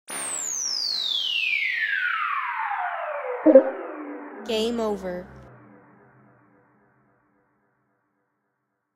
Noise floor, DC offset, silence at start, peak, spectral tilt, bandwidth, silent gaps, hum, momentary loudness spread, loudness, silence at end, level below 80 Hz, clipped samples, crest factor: -77 dBFS; under 0.1%; 0.1 s; 0 dBFS; -2 dB/octave; 16 kHz; none; none; 18 LU; -23 LUFS; 3.4 s; -62 dBFS; under 0.1%; 26 dB